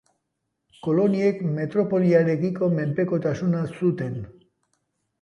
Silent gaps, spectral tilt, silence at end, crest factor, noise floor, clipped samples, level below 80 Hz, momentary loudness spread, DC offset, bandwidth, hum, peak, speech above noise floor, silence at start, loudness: none; -9 dB/octave; 0.9 s; 16 dB; -78 dBFS; under 0.1%; -62 dBFS; 11 LU; under 0.1%; 6.8 kHz; none; -8 dBFS; 56 dB; 0.85 s; -23 LUFS